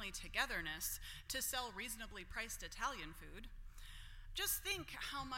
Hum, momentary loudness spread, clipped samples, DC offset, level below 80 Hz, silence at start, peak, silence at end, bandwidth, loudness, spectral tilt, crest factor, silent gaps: none; 17 LU; under 0.1%; under 0.1%; -56 dBFS; 0 s; -24 dBFS; 0 s; 16.5 kHz; -43 LUFS; -1 dB/octave; 22 dB; none